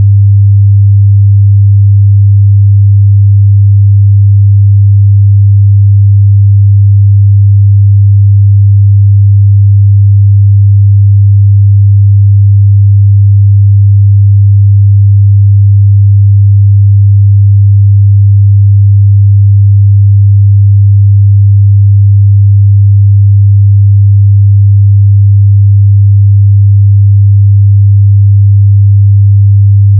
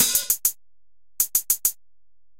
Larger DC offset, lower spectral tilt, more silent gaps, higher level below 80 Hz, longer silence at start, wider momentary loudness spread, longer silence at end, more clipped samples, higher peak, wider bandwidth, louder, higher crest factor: second, under 0.1% vs 0.5%; first, -31.5 dB/octave vs 1.5 dB/octave; neither; first, -36 dBFS vs -54 dBFS; about the same, 0 s vs 0 s; second, 0 LU vs 6 LU; second, 0 s vs 0.65 s; first, 0.3% vs under 0.1%; first, 0 dBFS vs -6 dBFS; second, 0.2 kHz vs 17 kHz; first, -5 LUFS vs -21 LUFS; second, 4 dB vs 20 dB